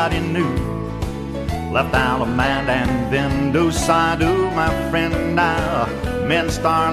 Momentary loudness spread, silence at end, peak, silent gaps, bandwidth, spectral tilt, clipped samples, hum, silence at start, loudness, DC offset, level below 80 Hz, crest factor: 8 LU; 0 s; -4 dBFS; none; 14 kHz; -5.5 dB/octave; under 0.1%; none; 0 s; -19 LUFS; under 0.1%; -32 dBFS; 16 dB